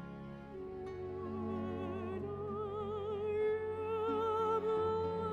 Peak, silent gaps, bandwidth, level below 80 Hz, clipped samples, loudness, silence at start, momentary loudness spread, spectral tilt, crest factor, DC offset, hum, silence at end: -24 dBFS; none; 7.2 kHz; -66 dBFS; under 0.1%; -38 LUFS; 0 s; 11 LU; -8 dB/octave; 14 dB; under 0.1%; none; 0 s